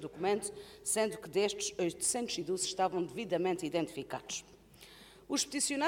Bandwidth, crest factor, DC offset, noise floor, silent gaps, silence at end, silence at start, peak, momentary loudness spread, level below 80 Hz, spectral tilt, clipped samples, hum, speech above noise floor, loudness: 18 kHz; 16 dB; under 0.1%; -57 dBFS; none; 0 s; 0 s; -18 dBFS; 10 LU; -68 dBFS; -2.5 dB/octave; under 0.1%; none; 22 dB; -35 LUFS